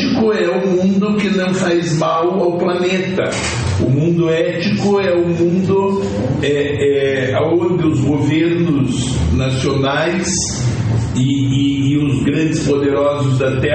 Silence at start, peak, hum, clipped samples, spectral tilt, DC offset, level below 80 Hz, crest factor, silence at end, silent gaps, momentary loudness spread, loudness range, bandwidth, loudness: 0 s; -4 dBFS; none; under 0.1%; -6 dB/octave; under 0.1%; -36 dBFS; 10 dB; 0 s; none; 3 LU; 1 LU; 8.8 kHz; -15 LUFS